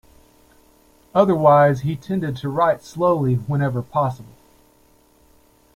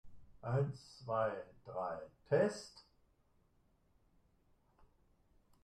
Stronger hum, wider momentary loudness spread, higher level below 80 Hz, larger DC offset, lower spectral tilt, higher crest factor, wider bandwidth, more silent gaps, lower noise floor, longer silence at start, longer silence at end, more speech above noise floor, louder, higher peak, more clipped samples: neither; second, 11 LU vs 15 LU; first, -54 dBFS vs -72 dBFS; neither; about the same, -8 dB/octave vs -7 dB/octave; about the same, 18 dB vs 22 dB; first, 15.5 kHz vs 11 kHz; neither; second, -56 dBFS vs -74 dBFS; first, 1.15 s vs 0.05 s; first, 1.5 s vs 0.8 s; about the same, 37 dB vs 35 dB; first, -19 LUFS vs -39 LUFS; first, -2 dBFS vs -20 dBFS; neither